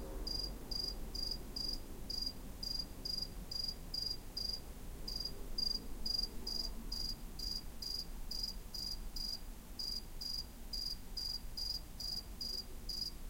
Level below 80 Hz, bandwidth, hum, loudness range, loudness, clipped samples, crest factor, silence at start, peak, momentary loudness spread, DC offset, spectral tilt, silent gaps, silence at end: -48 dBFS; 16.5 kHz; none; 2 LU; -41 LUFS; under 0.1%; 16 dB; 0 s; -26 dBFS; 5 LU; under 0.1%; -2.5 dB/octave; none; 0 s